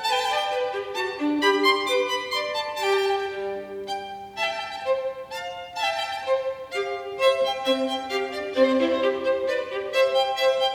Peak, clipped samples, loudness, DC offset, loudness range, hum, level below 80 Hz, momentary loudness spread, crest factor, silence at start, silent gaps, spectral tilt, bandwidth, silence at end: -6 dBFS; under 0.1%; -25 LUFS; under 0.1%; 5 LU; none; -64 dBFS; 11 LU; 18 dB; 0 s; none; -2.5 dB/octave; 17 kHz; 0 s